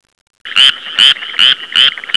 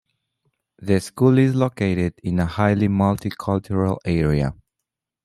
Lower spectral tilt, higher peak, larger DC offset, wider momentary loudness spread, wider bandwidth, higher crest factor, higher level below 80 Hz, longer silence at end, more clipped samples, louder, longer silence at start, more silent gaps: second, 1.5 dB/octave vs -8 dB/octave; first, 0 dBFS vs -4 dBFS; neither; second, 1 LU vs 7 LU; second, 11 kHz vs 14 kHz; second, 12 dB vs 18 dB; second, -60 dBFS vs -44 dBFS; second, 0 s vs 0.7 s; first, 1% vs under 0.1%; first, -8 LUFS vs -21 LUFS; second, 0.45 s vs 0.8 s; neither